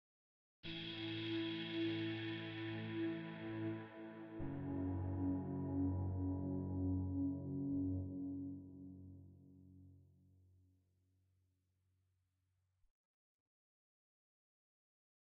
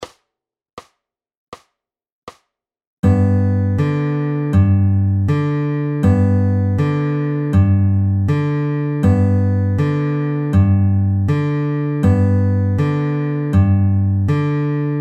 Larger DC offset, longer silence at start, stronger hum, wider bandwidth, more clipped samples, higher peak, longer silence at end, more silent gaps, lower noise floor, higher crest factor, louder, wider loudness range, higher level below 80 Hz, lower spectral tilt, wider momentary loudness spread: neither; first, 0.65 s vs 0 s; neither; first, 5.6 kHz vs 4.9 kHz; neither; second, -30 dBFS vs -2 dBFS; first, 5.3 s vs 0 s; second, none vs 0.73-0.77 s, 1.37-1.52 s, 2.12-2.27 s, 2.87-3.03 s; about the same, -84 dBFS vs -84 dBFS; about the same, 16 dB vs 14 dB; second, -44 LUFS vs -16 LUFS; first, 10 LU vs 4 LU; second, -68 dBFS vs -40 dBFS; second, -6 dB/octave vs -10 dB/octave; first, 15 LU vs 5 LU